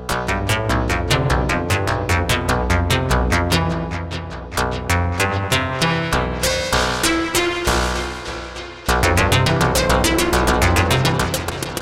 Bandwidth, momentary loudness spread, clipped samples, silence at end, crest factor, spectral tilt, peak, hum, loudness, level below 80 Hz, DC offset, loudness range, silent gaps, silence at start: 17 kHz; 9 LU; under 0.1%; 0 s; 14 dB; -4 dB/octave; -4 dBFS; none; -18 LUFS; -28 dBFS; under 0.1%; 3 LU; none; 0 s